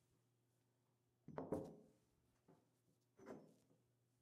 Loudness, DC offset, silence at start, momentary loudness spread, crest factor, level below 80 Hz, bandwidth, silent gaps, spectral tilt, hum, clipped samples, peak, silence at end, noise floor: -54 LUFS; under 0.1%; 1.3 s; 18 LU; 28 dB; -86 dBFS; 12.5 kHz; none; -8 dB/octave; none; under 0.1%; -32 dBFS; 0.45 s; -84 dBFS